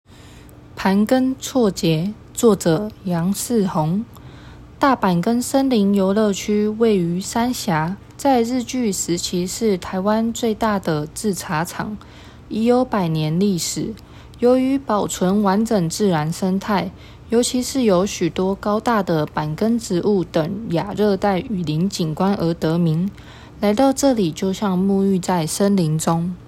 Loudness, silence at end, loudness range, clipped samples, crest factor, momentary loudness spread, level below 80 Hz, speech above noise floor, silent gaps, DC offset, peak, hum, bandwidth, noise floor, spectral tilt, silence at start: -19 LUFS; 0 s; 2 LU; under 0.1%; 16 dB; 6 LU; -46 dBFS; 24 dB; none; under 0.1%; -2 dBFS; none; 16.5 kHz; -42 dBFS; -5.5 dB/octave; 0.25 s